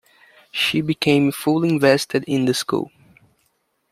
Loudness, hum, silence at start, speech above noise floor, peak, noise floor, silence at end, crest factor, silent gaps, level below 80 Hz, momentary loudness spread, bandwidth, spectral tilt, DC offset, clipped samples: -19 LUFS; none; 0.55 s; 49 dB; -2 dBFS; -68 dBFS; 1.1 s; 18 dB; none; -60 dBFS; 8 LU; 16 kHz; -5 dB/octave; under 0.1%; under 0.1%